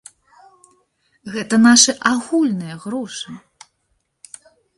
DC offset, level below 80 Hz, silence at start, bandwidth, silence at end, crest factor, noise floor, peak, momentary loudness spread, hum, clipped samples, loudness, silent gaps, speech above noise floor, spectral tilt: under 0.1%; -62 dBFS; 1.25 s; 11.5 kHz; 1.4 s; 20 dB; -69 dBFS; 0 dBFS; 22 LU; none; under 0.1%; -16 LUFS; none; 52 dB; -2.5 dB/octave